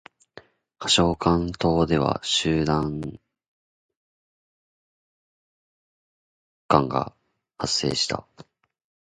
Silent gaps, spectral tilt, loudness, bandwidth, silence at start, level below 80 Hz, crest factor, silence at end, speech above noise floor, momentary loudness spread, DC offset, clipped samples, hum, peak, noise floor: 3.48-3.89 s, 3.96-6.69 s; -4.5 dB/octave; -23 LUFS; 9.6 kHz; 0.8 s; -46 dBFS; 26 dB; 0.65 s; 28 dB; 13 LU; under 0.1%; under 0.1%; none; 0 dBFS; -51 dBFS